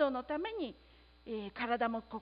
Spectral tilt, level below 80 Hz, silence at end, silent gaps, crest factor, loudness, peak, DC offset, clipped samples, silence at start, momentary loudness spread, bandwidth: -2.5 dB/octave; -64 dBFS; 0 s; none; 18 dB; -38 LUFS; -18 dBFS; under 0.1%; under 0.1%; 0 s; 10 LU; 5 kHz